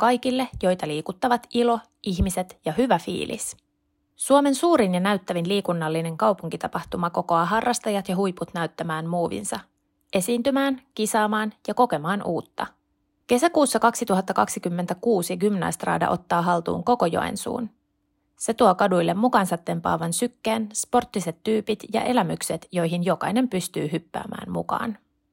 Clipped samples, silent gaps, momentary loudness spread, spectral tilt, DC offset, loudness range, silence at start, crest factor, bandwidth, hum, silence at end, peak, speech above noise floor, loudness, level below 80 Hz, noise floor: under 0.1%; none; 10 LU; -5 dB/octave; under 0.1%; 3 LU; 0 s; 20 dB; 16.5 kHz; none; 0.35 s; -4 dBFS; 49 dB; -24 LUFS; -48 dBFS; -72 dBFS